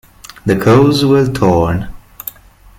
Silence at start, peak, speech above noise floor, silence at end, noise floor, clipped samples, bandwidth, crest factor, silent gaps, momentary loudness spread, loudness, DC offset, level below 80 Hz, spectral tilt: 0.45 s; 0 dBFS; 29 dB; 0.5 s; -40 dBFS; under 0.1%; 17 kHz; 12 dB; none; 19 LU; -12 LUFS; under 0.1%; -36 dBFS; -7 dB/octave